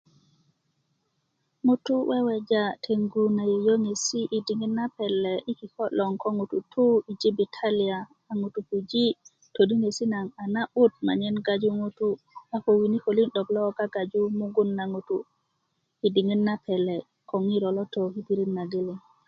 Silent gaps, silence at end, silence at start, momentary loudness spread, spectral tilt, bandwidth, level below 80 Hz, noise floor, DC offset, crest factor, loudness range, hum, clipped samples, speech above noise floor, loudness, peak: none; 0.3 s; 1.65 s; 9 LU; -5.5 dB/octave; 8.8 kHz; -72 dBFS; -76 dBFS; under 0.1%; 18 dB; 2 LU; none; under 0.1%; 50 dB; -26 LUFS; -8 dBFS